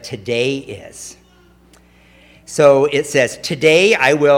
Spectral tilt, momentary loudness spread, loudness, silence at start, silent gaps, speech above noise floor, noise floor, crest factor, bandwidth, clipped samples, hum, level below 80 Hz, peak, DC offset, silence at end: -4 dB/octave; 21 LU; -14 LUFS; 0.05 s; none; 35 dB; -49 dBFS; 16 dB; 16.5 kHz; under 0.1%; none; -54 dBFS; 0 dBFS; under 0.1%; 0 s